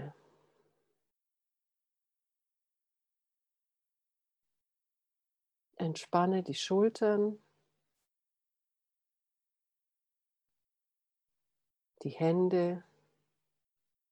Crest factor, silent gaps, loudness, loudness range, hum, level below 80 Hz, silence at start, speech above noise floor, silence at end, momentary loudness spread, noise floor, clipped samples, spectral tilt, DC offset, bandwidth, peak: 24 dB; none; -32 LUFS; 8 LU; none; -88 dBFS; 0 s; 59 dB; 1.3 s; 15 LU; -89 dBFS; under 0.1%; -6.5 dB/octave; under 0.1%; 11 kHz; -14 dBFS